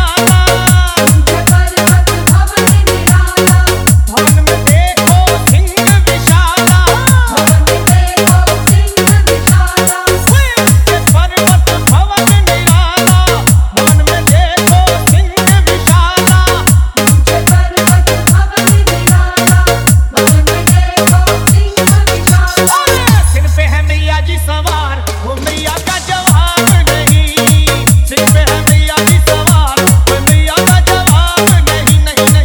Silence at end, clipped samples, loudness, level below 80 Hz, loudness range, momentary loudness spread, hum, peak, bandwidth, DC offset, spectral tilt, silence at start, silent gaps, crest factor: 0 s; 1%; -8 LUFS; -14 dBFS; 2 LU; 2 LU; none; 0 dBFS; over 20 kHz; 0.4%; -4 dB/octave; 0 s; none; 8 dB